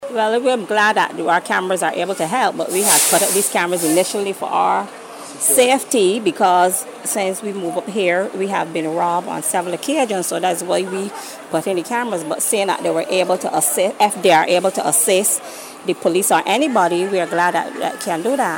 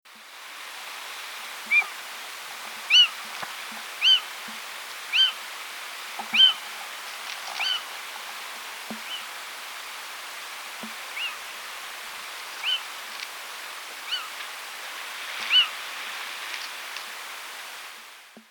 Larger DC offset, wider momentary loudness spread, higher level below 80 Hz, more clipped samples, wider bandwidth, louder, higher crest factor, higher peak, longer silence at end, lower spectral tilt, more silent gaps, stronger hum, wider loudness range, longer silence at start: neither; second, 9 LU vs 17 LU; first, -72 dBFS vs -82 dBFS; neither; second, 17 kHz vs over 20 kHz; first, -17 LUFS vs -26 LUFS; second, 16 dB vs 22 dB; first, -2 dBFS vs -6 dBFS; about the same, 0 s vs 0.1 s; first, -2.5 dB/octave vs 2 dB/octave; neither; neither; second, 4 LU vs 12 LU; about the same, 0 s vs 0.05 s